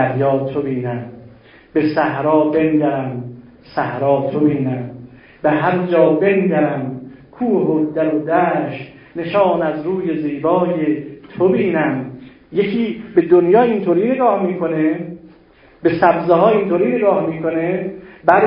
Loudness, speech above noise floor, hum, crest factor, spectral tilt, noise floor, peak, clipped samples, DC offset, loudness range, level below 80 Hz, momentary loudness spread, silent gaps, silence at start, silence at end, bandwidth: -17 LUFS; 32 dB; none; 16 dB; -11 dB/octave; -48 dBFS; 0 dBFS; under 0.1%; under 0.1%; 3 LU; -54 dBFS; 13 LU; none; 0 s; 0 s; 5.4 kHz